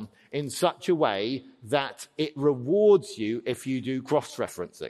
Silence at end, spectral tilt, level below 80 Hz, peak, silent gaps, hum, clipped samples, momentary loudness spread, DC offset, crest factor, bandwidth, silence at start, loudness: 0 s; -5.5 dB/octave; -70 dBFS; -8 dBFS; none; none; under 0.1%; 12 LU; under 0.1%; 18 dB; 13 kHz; 0 s; -27 LUFS